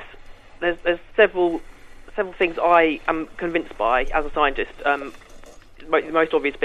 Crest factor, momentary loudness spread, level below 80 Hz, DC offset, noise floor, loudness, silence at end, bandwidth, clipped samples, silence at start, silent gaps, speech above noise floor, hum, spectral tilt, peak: 20 dB; 9 LU; -40 dBFS; under 0.1%; -42 dBFS; -21 LUFS; 0 s; 10.5 kHz; under 0.1%; 0 s; none; 21 dB; none; -5.5 dB/octave; -4 dBFS